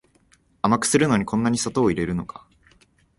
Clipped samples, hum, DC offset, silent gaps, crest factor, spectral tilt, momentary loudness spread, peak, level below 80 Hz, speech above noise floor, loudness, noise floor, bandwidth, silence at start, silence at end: under 0.1%; none; under 0.1%; none; 20 dB; -5 dB/octave; 9 LU; -4 dBFS; -50 dBFS; 39 dB; -22 LUFS; -60 dBFS; 11.5 kHz; 0.65 s; 0.95 s